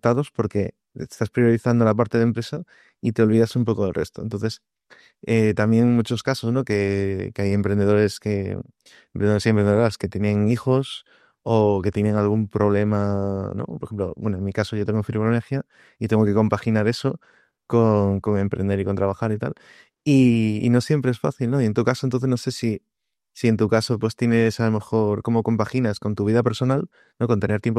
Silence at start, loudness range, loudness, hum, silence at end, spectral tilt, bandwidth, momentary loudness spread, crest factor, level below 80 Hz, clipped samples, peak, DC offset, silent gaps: 0.05 s; 2 LU; -22 LUFS; none; 0 s; -7.5 dB/octave; 13 kHz; 11 LU; 18 dB; -56 dBFS; under 0.1%; -4 dBFS; under 0.1%; none